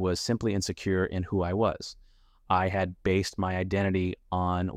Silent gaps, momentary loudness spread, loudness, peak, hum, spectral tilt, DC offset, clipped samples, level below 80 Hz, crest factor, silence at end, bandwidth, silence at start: none; 4 LU; -29 LUFS; -12 dBFS; none; -6 dB/octave; under 0.1%; under 0.1%; -50 dBFS; 16 dB; 0 s; 14 kHz; 0 s